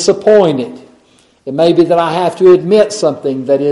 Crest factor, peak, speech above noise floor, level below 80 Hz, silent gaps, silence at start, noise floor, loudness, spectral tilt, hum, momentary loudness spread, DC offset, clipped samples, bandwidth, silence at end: 10 dB; 0 dBFS; 39 dB; -54 dBFS; none; 0 s; -49 dBFS; -11 LUFS; -5.5 dB/octave; none; 11 LU; under 0.1%; under 0.1%; 11.5 kHz; 0 s